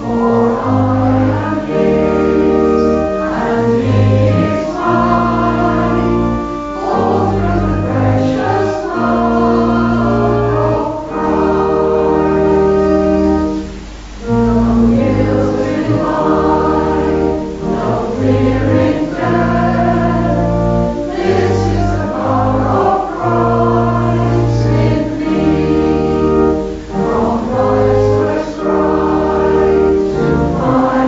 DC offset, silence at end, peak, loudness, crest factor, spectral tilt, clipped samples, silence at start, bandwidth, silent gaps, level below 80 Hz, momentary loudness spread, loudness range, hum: under 0.1%; 0 s; -2 dBFS; -13 LUFS; 12 dB; -8.5 dB/octave; under 0.1%; 0 s; 7.8 kHz; none; -28 dBFS; 5 LU; 1 LU; none